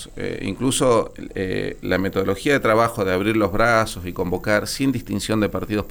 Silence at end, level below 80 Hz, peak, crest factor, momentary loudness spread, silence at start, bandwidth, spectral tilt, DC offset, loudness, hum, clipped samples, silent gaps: 0 s; -40 dBFS; -6 dBFS; 16 dB; 9 LU; 0 s; 19 kHz; -5 dB/octave; under 0.1%; -21 LUFS; none; under 0.1%; none